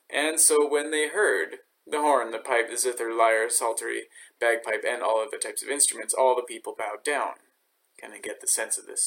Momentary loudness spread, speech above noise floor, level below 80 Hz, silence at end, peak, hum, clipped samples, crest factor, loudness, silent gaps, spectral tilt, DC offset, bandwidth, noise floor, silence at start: 12 LU; 44 dB; -82 dBFS; 0 s; -6 dBFS; none; under 0.1%; 20 dB; -25 LUFS; none; 1 dB/octave; under 0.1%; 17 kHz; -70 dBFS; 0.1 s